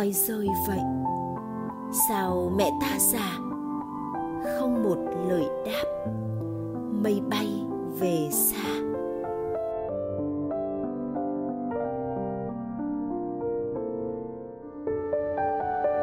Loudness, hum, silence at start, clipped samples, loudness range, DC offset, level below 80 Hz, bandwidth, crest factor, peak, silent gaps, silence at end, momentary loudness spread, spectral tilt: -29 LUFS; none; 0 s; under 0.1%; 5 LU; under 0.1%; -56 dBFS; 16 kHz; 18 dB; -10 dBFS; none; 0 s; 9 LU; -4.5 dB/octave